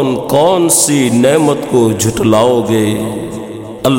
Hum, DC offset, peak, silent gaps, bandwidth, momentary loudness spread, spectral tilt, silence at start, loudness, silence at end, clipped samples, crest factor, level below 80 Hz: none; under 0.1%; 0 dBFS; none; 17 kHz; 12 LU; -4.5 dB/octave; 0 s; -11 LUFS; 0 s; under 0.1%; 12 dB; -42 dBFS